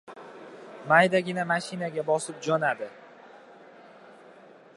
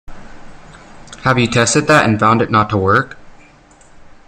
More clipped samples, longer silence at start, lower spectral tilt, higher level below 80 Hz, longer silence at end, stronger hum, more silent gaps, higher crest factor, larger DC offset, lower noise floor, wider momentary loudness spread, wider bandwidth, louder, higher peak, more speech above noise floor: neither; about the same, 0.1 s vs 0.1 s; about the same, -4.5 dB/octave vs -4.5 dB/octave; second, -80 dBFS vs -42 dBFS; first, 0.65 s vs 0.15 s; neither; neither; first, 24 dB vs 16 dB; neither; first, -52 dBFS vs -45 dBFS; first, 24 LU vs 6 LU; second, 11.5 kHz vs 15 kHz; second, -26 LUFS vs -13 LUFS; second, -4 dBFS vs 0 dBFS; second, 26 dB vs 32 dB